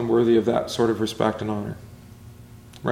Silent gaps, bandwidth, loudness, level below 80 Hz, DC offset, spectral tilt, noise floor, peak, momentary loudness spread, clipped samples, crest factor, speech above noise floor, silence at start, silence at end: none; 14.5 kHz; -23 LUFS; -54 dBFS; under 0.1%; -6 dB/octave; -45 dBFS; -6 dBFS; 13 LU; under 0.1%; 18 dB; 23 dB; 0 s; 0 s